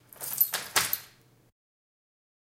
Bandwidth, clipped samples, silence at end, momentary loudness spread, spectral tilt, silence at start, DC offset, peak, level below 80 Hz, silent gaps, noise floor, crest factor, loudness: 17 kHz; under 0.1%; 1.4 s; 9 LU; 0.5 dB/octave; 0.2 s; under 0.1%; -8 dBFS; -70 dBFS; none; -57 dBFS; 26 dB; -27 LUFS